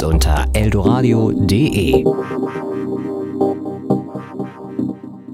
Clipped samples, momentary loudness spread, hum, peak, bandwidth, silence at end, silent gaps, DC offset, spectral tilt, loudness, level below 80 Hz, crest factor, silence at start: under 0.1%; 12 LU; none; 0 dBFS; 16 kHz; 0 s; none; under 0.1%; -6.5 dB/octave; -17 LUFS; -24 dBFS; 16 dB; 0 s